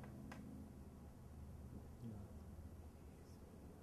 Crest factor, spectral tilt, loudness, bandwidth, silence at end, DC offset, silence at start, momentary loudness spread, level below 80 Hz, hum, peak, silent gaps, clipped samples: 16 dB; -7 dB/octave; -57 LUFS; 13.5 kHz; 0 s; under 0.1%; 0 s; 5 LU; -62 dBFS; none; -40 dBFS; none; under 0.1%